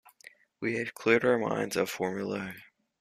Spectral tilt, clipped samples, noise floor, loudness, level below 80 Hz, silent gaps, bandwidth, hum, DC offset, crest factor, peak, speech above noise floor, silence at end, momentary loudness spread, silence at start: -5 dB/octave; under 0.1%; -57 dBFS; -30 LUFS; -70 dBFS; none; 15 kHz; none; under 0.1%; 22 dB; -10 dBFS; 27 dB; 0.35 s; 12 LU; 0.6 s